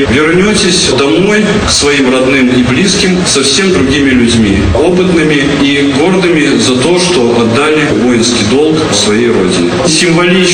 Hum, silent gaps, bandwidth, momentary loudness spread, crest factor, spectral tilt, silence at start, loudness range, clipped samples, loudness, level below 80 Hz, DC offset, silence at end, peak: none; none; 11.5 kHz; 2 LU; 8 dB; -4 dB/octave; 0 s; 1 LU; 0.3%; -7 LUFS; -28 dBFS; under 0.1%; 0 s; 0 dBFS